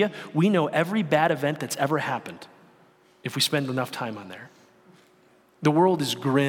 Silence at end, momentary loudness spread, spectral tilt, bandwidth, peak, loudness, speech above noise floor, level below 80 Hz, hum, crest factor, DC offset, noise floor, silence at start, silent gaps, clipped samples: 0 s; 17 LU; -5 dB/octave; 18 kHz; -6 dBFS; -24 LUFS; 35 dB; -74 dBFS; none; 18 dB; under 0.1%; -59 dBFS; 0 s; none; under 0.1%